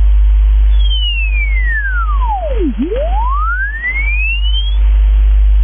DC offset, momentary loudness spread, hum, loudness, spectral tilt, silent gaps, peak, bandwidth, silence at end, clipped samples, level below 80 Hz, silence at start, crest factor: under 0.1%; 4 LU; none; -14 LUFS; -9.5 dB/octave; none; -4 dBFS; 3.6 kHz; 0 s; under 0.1%; -12 dBFS; 0 s; 6 dB